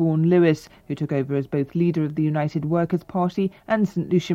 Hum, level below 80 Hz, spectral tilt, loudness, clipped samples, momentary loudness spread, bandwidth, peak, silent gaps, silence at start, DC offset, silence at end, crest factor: none; -58 dBFS; -8.5 dB/octave; -23 LUFS; under 0.1%; 8 LU; 8 kHz; -6 dBFS; none; 0 s; under 0.1%; 0 s; 16 dB